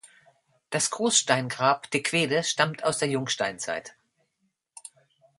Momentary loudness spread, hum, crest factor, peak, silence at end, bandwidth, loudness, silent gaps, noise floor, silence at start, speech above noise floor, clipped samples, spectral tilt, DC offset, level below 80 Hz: 12 LU; none; 24 dB; -4 dBFS; 1.5 s; 11.5 kHz; -25 LUFS; none; -76 dBFS; 0.05 s; 50 dB; under 0.1%; -2.5 dB/octave; under 0.1%; -72 dBFS